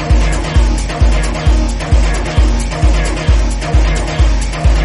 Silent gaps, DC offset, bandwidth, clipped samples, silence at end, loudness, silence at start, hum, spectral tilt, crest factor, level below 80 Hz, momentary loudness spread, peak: none; under 0.1%; 11 kHz; under 0.1%; 0 s; -14 LUFS; 0 s; none; -5.5 dB/octave; 10 dB; -12 dBFS; 1 LU; 0 dBFS